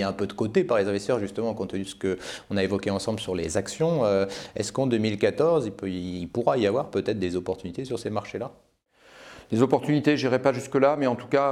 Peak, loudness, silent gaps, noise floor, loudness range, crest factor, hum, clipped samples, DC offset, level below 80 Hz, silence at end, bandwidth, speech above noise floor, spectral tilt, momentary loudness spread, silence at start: -6 dBFS; -26 LUFS; none; -58 dBFS; 3 LU; 18 dB; none; under 0.1%; under 0.1%; -58 dBFS; 0 s; 13.5 kHz; 33 dB; -6 dB/octave; 10 LU; 0 s